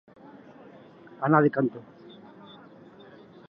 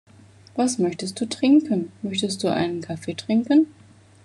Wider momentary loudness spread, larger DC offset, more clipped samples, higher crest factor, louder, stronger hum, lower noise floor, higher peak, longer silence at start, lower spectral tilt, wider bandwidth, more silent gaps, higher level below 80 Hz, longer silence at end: first, 28 LU vs 11 LU; neither; neither; first, 24 dB vs 16 dB; about the same, -24 LUFS vs -23 LUFS; neither; about the same, -50 dBFS vs -49 dBFS; about the same, -6 dBFS vs -8 dBFS; first, 1.2 s vs 0.55 s; first, -11 dB/octave vs -5 dB/octave; second, 5.4 kHz vs 11.5 kHz; neither; second, -76 dBFS vs -66 dBFS; first, 1.65 s vs 0.55 s